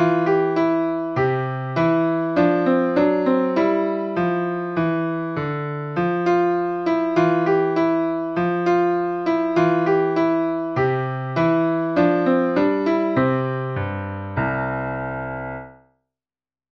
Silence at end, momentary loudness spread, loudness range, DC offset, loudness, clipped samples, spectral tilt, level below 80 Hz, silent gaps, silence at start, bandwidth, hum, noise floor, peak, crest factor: 1.1 s; 8 LU; 3 LU; under 0.1%; -21 LUFS; under 0.1%; -8.5 dB/octave; -52 dBFS; none; 0 s; 6.2 kHz; none; under -90 dBFS; -6 dBFS; 14 dB